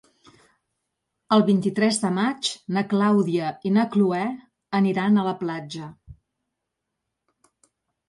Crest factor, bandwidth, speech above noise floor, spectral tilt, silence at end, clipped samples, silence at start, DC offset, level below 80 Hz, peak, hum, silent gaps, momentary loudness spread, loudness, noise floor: 18 dB; 11.5 kHz; 60 dB; -5.5 dB/octave; 1.95 s; under 0.1%; 1.3 s; under 0.1%; -64 dBFS; -8 dBFS; none; none; 11 LU; -22 LUFS; -82 dBFS